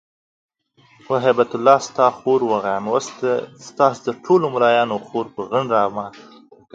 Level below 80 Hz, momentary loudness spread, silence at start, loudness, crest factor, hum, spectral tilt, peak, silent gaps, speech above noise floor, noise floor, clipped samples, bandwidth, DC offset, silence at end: -66 dBFS; 10 LU; 1.1 s; -19 LUFS; 20 dB; none; -5 dB/octave; 0 dBFS; none; 37 dB; -55 dBFS; under 0.1%; 8 kHz; under 0.1%; 0.55 s